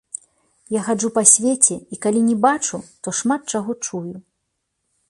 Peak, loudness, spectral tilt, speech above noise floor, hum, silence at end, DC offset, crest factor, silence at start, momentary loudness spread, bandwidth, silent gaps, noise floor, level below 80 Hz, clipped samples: 0 dBFS; -18 LUFS; -3.5 dB/octave; 56 dB; none; 0.9 s; under 0.1%; 20 dB; 0.7 s; 18 LU; 11.5 kHz; none; -75 dBFS; -64 dBFS; under 0.1%